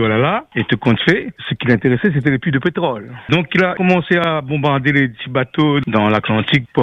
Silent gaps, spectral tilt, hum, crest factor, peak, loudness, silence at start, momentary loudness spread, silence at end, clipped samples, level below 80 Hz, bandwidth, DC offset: none; -8 dB/octave; none; 14 dB; 0 dBFS; -16 LUFS; 0 s; 5 LU; 0 s; under 0.1%; -48 dBFS; 7.6 kHz; under 0.1%